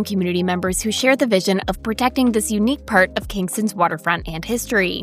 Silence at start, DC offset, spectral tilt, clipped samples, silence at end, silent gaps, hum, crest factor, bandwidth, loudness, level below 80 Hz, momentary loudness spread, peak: 0 s; under 0.1%; -4 dB/octave; under 0.1%; 0 s; none; none; 18 dB; 16 kHz; -19 LUFS; -40 dBFS; 7 LU; -2 dBFS